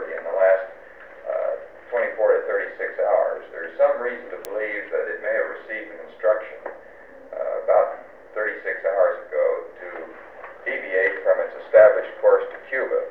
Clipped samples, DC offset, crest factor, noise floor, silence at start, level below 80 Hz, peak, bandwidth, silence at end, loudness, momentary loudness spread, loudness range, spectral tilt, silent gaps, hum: under 0.1%; 0.2%; 20 dB; -45 dBFS; 0 s; -66 dBFS; -2 dBFS; 4.4 kHz; 0 s; -22 LUFS; 18 LU; 5 LU; -4.5 dB/octave; none; none